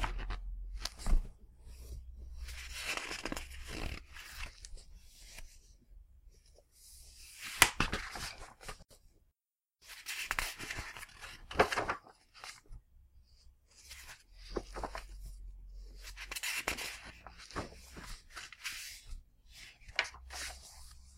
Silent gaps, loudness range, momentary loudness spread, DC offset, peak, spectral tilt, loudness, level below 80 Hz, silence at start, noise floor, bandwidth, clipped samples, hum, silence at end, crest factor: none; 13 LU; 19 LU; under 0.1%; -6 dBFS; -2 dB/octave; -39 LUFS; -46 dBFS; 0 s; under -90 dBFS; 16 kHz; under 0.1%; none; 0 s; 36 dB